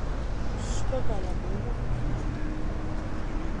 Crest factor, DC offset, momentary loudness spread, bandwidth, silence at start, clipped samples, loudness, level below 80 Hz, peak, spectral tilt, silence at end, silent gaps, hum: 12 dB; under 0.1%; 3 LU; 10 kHz; 0 s; under 0.1%; -33 LUFS; -32 dBFS; -14 dBFS; -6.5 dB/octave; 0 s; none; none